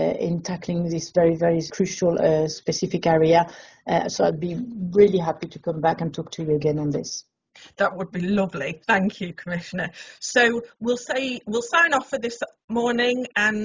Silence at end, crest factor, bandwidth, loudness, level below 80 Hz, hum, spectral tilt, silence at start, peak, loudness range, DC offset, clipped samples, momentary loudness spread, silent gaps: 0 s; 18 dB; 7.6 kHz; -23 LUFS; -56 dBFS; none; -5 dB/octave; 0 s; -4 dBFS; 4 LU; under 0.1%; under 0.1%; 12 LU; 12.64-12.68 s